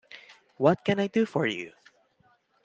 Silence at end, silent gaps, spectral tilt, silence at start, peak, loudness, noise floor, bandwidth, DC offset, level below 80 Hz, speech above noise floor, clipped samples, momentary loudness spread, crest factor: 0.95 s; none; -6.5 dB/octave; 0.15 s; -8 dBFS; -27 LUFS; -66 dBFS; 8.2 kHz; under 0.1%; -70 dBFS; 41 dB; under 0.1%; 21 LU; 22 dB